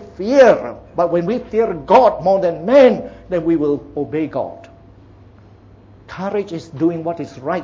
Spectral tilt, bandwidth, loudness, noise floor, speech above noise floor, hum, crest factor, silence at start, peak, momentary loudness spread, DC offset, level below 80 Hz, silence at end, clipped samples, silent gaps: -7 dB/octave; 7.4 kHz; -16 LUFS; -44 dBFS; 28 dB; none; 16 dB; 0 s; 0 dBFS; 15 LU; under 0.1%; -48 dBFS; 0 s; under 0.1%; none